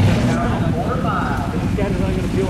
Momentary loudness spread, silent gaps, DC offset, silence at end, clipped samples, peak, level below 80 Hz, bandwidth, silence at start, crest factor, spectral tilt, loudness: 3 LU; none; under 0.1%; 0 s; under 0.1%; -4 dBFS; -28 dBFS; 14 kHz; 0 s; 12 dB; -7 dB/octave; -19 LUFS